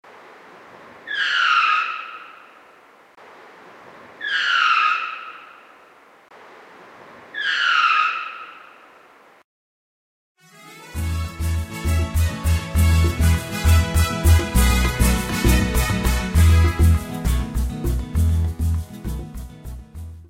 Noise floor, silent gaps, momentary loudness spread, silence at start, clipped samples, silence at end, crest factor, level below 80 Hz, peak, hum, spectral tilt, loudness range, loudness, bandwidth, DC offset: -50 dBFS; 9.44-10.35 s; 20 LU; 0.55 s; under 0.1%; 0.05 s; 18 dB; -26 dBFS; -4 dBFS; none; -4.5 dB/octave; 7 LU; -20 LUFS; 16 kHz; under 0.1%